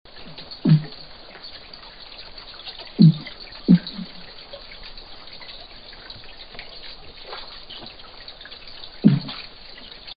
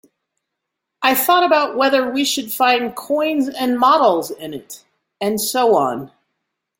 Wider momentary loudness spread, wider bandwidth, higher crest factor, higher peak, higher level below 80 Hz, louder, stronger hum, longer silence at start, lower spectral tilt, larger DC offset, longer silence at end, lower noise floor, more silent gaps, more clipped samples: first, 21 LU vs 16 LU; second, 5.2 kHz vs 17 kHz; first, 24 dB vs 16 dB; about the same, 0 dBFS vs -2 dBFS; first, -52 dBFS vs -64 dBFS; second, -20 LUFS vs -16 LUFS; neither; second, 0.15 s vs 1 s; first, -11.5 dB/octave vs -3 dB/octave; neither; second, 0.05 s vs 0.7 s; second, -41 dBFS vs -79 dBFS; neither; neither